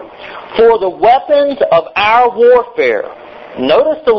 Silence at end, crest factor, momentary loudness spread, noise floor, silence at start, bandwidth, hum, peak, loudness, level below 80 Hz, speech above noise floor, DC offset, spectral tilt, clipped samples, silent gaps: 0 s; 10 dB; 14 LU; -29 dBFS; 0 s; 6 kHz; none; 0 dBFS; -11 LUFS; -46 dBFS; 20 dB; under 0.1%; -6 dB/octave; under 0.1%; none